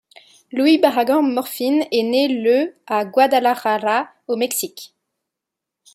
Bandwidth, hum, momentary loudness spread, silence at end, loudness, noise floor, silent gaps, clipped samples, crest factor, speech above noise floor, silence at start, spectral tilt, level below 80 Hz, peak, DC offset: 16 kHz; none; 8 LU; 1.1 s; -18 LUFS; -84 dBFS; none; under 0.1%; 16 dB; 66 dB; 0.55 s; -3 dB/octave; -72 dBFS; -2 dBFS; under 0.1%